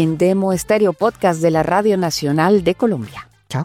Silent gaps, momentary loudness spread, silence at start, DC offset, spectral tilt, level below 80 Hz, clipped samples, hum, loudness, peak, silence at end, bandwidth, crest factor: none; 9 LU; 0 s; under 0.1%; -6 dB/octave; -48 dBFS; under 0.1%; none; -16 LUFS; -4 dBFS; 0 s; 16.5 kHz; 12 dB